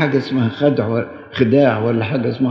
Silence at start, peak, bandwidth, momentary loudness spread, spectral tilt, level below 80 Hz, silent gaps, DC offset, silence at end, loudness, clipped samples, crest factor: 0 s; 0 dBFS; 6.2 kHz; 7 LU; -9 dB/octave; -56 dBFS; none; under 0.1%; 0 s; -17 LUFS; under 0.1%; 16 dB